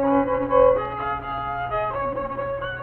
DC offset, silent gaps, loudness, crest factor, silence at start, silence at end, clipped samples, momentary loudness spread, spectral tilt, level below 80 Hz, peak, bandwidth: under 0.1%; none; -23 LUFS; 18 dB; 0 s; 0 s; under 0.1%; 10 LU; -9.5 dB/octave; -42 dBFS; -6 dBFS; 4.3 kHz